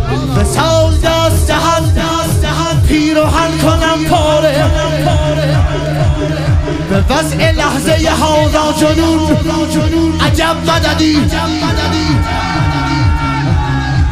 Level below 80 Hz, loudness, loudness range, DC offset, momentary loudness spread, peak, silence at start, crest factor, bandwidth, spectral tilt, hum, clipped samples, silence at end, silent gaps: -20 dBFS; -12 LUFS; 1 LU; under 0.1%; 3 LU; 0 dBFS; 0 s; 10 dB; 15.5 kHz; -5.5 dB/octave; none; under 0.1%; 0 s; none